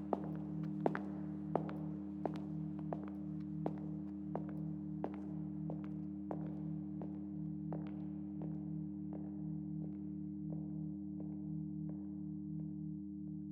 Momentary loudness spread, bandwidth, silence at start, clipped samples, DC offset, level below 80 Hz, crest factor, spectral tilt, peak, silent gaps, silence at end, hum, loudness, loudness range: 4 LU; 4.5 kHz; 0 s; under 0.1%; under 0.1%; -70 dBFS; 28 dB; -11 dB/octave; -16 dBFS; none; 0 s; none; -44 LUFS; 2 LU